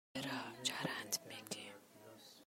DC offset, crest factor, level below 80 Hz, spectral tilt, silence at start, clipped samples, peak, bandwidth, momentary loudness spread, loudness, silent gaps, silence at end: under 0.1%; 24 dB; -86 dBFS; -2 dB/octave; 0.15 s; under 0.1%; -22 dBFS; 16 kHz; 18 LU; -43 LUFS; none; 0 s